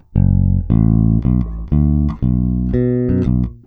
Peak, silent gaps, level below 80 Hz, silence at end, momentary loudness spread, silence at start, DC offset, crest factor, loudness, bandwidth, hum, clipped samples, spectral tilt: -2 dBFS; none; -22 dBFS; 0.1 s; 4 LU; 0.15 s; under 0.1%; 12 dB; -16 LUFS; 3.7 kHz; none; under 0.1%; -13 dB/octave